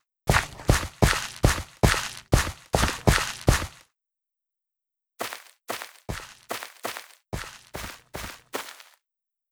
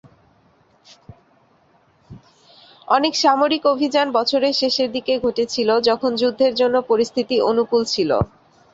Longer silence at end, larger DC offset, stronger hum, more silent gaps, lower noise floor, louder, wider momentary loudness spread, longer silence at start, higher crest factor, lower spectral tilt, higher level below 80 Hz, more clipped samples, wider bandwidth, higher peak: first, 0.8 s vs 0.5 s; neither; neither; neither; first, -87 dBFS vs -57 dBFS; second, -26 LUFS vs -18 LUFS; first, 15 LU vs 4 LU; second, 0.25 s vs 1.1 s; first, 24 dB vs 18 dB; about the same, -4 dB/octave vs -4.5 dB/octave; first, -34 dBFS vs -50 dBFS; neither; first, over 20 kHz vs 8 kHz; about the same, -4 dBFS vs -2 dBFS